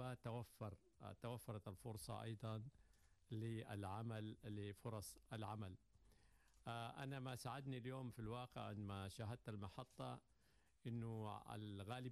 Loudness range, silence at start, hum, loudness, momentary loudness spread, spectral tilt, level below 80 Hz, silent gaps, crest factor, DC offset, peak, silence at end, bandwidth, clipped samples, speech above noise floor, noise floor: 2 LU; 0 s; none; -53 LUFS; 6 LU; -6 dB/octave; -74 dBFS; none; 14 dB; under 0.1%; -38 dBFS; 0 s; 13 kHz; under 0.1%; 28 dB; -79 dBFS